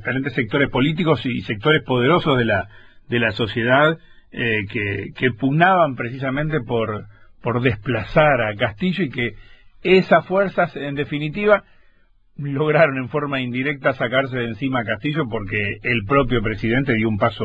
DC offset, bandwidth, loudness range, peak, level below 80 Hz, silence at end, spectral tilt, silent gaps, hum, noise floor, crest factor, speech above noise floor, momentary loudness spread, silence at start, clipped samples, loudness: 0.1%; 8 kHz; 2 LU; -2 dBFS; -42 dBFS; 0 s; -8.5 dB/octave; none; none; -55 dBFS; 18 dB; 35 dB; 9 LU; 0 s; under 0.1%; -20 LUFS